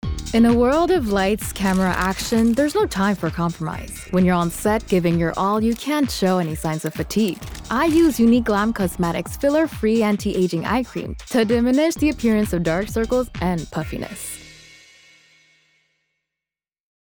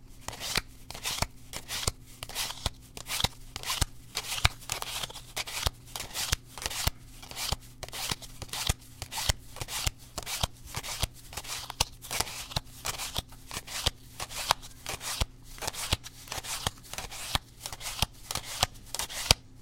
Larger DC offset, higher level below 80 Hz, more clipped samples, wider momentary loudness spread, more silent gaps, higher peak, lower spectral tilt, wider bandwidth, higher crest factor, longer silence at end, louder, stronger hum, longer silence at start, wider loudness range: neither; about the same, -38 dBFS vs -42 dBFS; neither; about the same, 9 LU vs 9 LU; neither; second, -6 dBFS vs 0 dBFS; first, -6 dB/octave vs -1.5 dB/octave; first, over 20 kHz vs 17 kHz; second, 14 dB vs 34 dB; first, 2.5 s vs 0 s; first, -20 LUFS vs -33 LUFS; neither; about the same, 0.05 s vs 0 s; first, 7 LU vs 2 LU